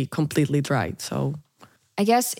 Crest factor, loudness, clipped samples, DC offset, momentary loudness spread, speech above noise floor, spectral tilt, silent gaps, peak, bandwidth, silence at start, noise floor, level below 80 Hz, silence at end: 16 dB; -24 LUFS; under 0.1%; under 0.1%; 11 LU; 32 dB; -5.5 dB/octave; none; -8 dBFS; 17 kHz; 0 s; -55 dBFS; -62 dBFS; 0 s